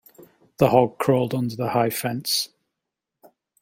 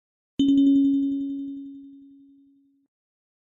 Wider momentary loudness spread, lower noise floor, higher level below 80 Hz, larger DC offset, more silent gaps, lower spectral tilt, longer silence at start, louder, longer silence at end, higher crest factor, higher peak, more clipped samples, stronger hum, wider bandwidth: second, 8 LU vs 21 LU; first, -84 dBFS vs -60 dBFS; about the same, -60 dBFS vs -64 dBFS; neither; neither; second, -5 dB/octave vs -7 dB/octave; first, 0.6 s vs 0.4 s; about the same, -22 LUFS vs -22 LUFS; second, 1.15 s vs 1.6 s; first, 22 dB vs 14 dB; first, -2 dBFS vs -12 dBFS; neither; neither; first, 17 kHz vs 6.8 kHz